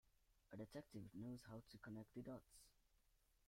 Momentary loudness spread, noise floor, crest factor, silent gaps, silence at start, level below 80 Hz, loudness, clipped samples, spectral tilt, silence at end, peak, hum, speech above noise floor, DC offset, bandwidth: 5 LU; -80 dBFS; 18 dB; none; 0.05 s; -78 dBFS; -58 LUFS; under 0.1%; -6.5 dB/octave; 0 s; -42 dBFS; none; 23 dB; under 0.1%; 16 kHz